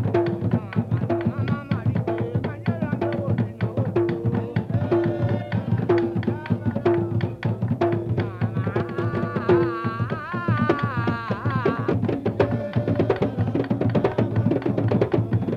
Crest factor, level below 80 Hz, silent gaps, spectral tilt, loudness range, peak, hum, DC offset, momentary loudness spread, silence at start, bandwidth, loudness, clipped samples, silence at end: 18 dB; -50 dBFS; none; -9.5 dB/octave; 2 LU; -6 dBFS; none; under 0.1%; 4 LU; 0 s; 5.8 kHz; -24 LUFS; under 0.1%; 0 s